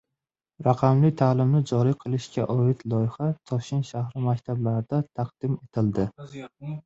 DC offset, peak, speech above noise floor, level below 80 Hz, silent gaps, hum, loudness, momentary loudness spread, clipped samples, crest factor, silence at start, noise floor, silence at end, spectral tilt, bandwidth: under 0.1%; -6 dBFS; 62 dB; -56 dBFS; none; none; -25 LUFS; 10 LU; under 0.1%; 20 dB; 0.6 s; -86 dBFS; 0.05 s; -8.5 dB/octave; 7.8 kHz